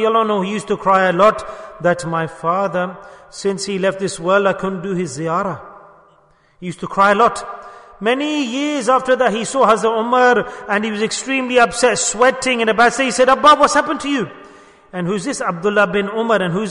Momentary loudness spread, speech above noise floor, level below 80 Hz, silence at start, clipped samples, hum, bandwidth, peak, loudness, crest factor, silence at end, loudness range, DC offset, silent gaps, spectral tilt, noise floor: 11 LU; 37 dB; -52 dBFS; 0 s; under 0.1%; none; 11 kHz; -2 dBFS; -16 LUFS; 16 dB; 0 s; 6 LU; under 0.1%; none; -4 dB/octave; -53 dBFS